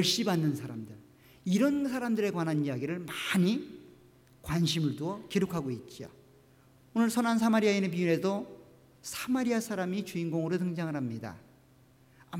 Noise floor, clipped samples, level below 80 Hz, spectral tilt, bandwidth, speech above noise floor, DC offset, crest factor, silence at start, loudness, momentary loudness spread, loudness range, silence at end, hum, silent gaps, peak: -61 dBFS; under 0.1%; -64 dBFS; -5.5 dB/octave; 16.5 kHz; 31 dB; under 0.1%; 16 dB; 0 s; -31 LUFS; 17 LU; 4 LU; 0 s; none; none; -16 dBFS